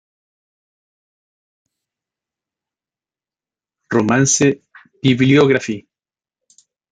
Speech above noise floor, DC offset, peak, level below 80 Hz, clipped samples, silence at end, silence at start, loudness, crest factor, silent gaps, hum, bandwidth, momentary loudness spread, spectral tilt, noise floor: over 76 dB; under 0.1%; -2 dBFS; -60 dBFS; under 0.1%; 1.1 s; 3.9 s; -15 LUFS; 18 dB; none; none; 9.6 kHz; 15 LU; -4.5 dB/octave; under -90 dBFS